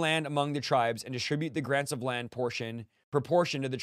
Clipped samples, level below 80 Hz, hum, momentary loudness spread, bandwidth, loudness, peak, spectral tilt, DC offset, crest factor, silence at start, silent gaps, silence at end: under 0.1%; -72 dBFS; none; 6 LU; 15.5 kHz; -31 LUFS; -12 dBFS; -5 dB/octave; under 0.1%; 18 dB; 0 s; 3.04-3.12 s; 0 s